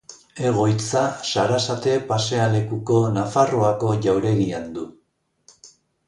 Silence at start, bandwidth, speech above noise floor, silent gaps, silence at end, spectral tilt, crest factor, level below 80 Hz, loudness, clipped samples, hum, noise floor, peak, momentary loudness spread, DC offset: 0.1 s; 11.5 kHz; 47 dB; none; 0.4 s; -5.5 dB/octave; 16 dB; -54 dBFS; -21 LUFS; under 0.1%; none; -67 dBFS; -4 dBFS; 7 LU; under 0.1%